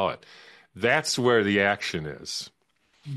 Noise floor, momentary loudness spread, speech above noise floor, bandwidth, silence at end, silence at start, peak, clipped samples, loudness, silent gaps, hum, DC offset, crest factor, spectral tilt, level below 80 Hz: -68 dBFS; 13 LU; 42 dB; 12.5 kHz; 0 s; 0 s; -8 dBFS; under 0.1%; -25 LUFS; none; none; under 0.1%; 20 dB; -4 dB/octave; -62 dBFS